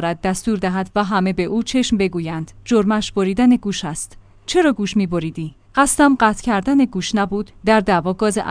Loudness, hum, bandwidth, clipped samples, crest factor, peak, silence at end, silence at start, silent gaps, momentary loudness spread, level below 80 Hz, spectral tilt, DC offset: -18 LUFS; none; 10.5 kHz; under 0.1%; 16 dB; -2 dBFS; 0 s; 0 s; none; 10 LU; -42 dBFS; -5 dB/octave; under 0.1%